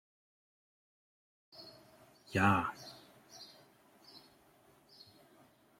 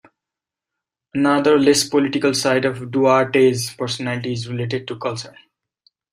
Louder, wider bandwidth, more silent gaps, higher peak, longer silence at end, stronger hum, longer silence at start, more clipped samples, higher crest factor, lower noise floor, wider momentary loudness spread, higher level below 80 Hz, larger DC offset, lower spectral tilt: second, -33 LUFS vs -18 LUFS; about the same, 16.5 kHz vs 16 kHz; neither; second, -16 dBFS vs -2 dBFS; first, 1.6 s vs 0.85 s; neither; first, 1.6 s vs 1.15 s; neither; first, 26 dB vs 18 dB; second, -66 dBFS vs -86 dBFS; first, 28 LU vs 12 LU; second, -74 dBFS vs -62 dBFS; neither; first, -6 dB/octave vs -4.5 dB/octave